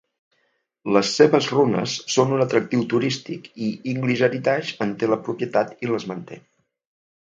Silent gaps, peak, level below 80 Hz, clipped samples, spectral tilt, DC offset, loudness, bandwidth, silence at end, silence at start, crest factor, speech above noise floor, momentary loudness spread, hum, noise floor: none; -2 dBFS; -68 dBFS; under 0.1%; -5 dB/octave; under 0.1%; -21 LUFS; 9 kHz; 0.85 s; 0.85 s; 22 dB; 48 dB; 12 LU; none; -70 dBFS